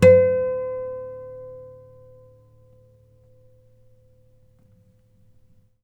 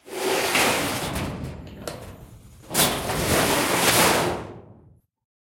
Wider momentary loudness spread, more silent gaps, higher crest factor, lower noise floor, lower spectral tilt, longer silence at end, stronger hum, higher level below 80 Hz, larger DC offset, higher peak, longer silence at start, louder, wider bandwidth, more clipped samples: first, 27 LU vs 19 LU; neither; about the same, 22 dB vs 20 dB; about the same, -57 dBFS vs -54 dBFS; first, -7.5 dB/octave vs -2.5 dB/octave; first, 4.15 s vs 0.7 s; neither; second, -54 dBFS vs -46 dBFS; neither; about the same, -2 dBFS vs -4 dBFS; about the same, 0 s vs 0.05 s; about the same, -22 LUFS vs -21 LUFS; second, 9.4 kHz vs 16.5 kHz; neither